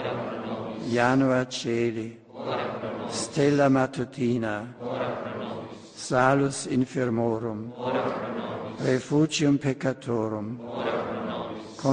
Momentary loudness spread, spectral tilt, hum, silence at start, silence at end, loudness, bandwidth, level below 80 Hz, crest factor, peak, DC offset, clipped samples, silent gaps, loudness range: 12 LU; -5.5 dB/octave; none; 0 s; 0 s; -27 LUFS; 10 kHz; -62 dBFS; 22 dB; -6 dBFS; under 0.1%; under 0.1%; none; 1 LU